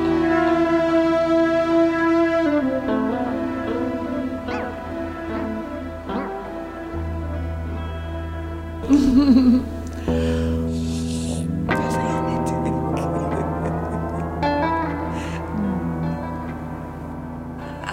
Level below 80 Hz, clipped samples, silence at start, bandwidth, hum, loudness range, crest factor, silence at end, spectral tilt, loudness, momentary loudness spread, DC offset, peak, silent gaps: -36 dBFS; under 0.1%; 0 s; 14 kHz; none; 9 LU; 16 dB; 0 s; -7 dB/octave; -22 LUFS; 12 LU; under 0.1%; -4 dBFS; none